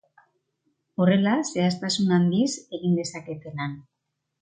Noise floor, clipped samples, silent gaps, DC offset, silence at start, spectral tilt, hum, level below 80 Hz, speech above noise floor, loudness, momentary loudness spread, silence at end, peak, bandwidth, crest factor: -80 dBFS; under 0.1%; none; under 0.1%; 1 s; -5.5 dB/octave; none; -68 dBFS; 57 dB; -24 LUFS; 15 LU; 0.6 s; -6 dBFS; 9.4 kHz; 18 dB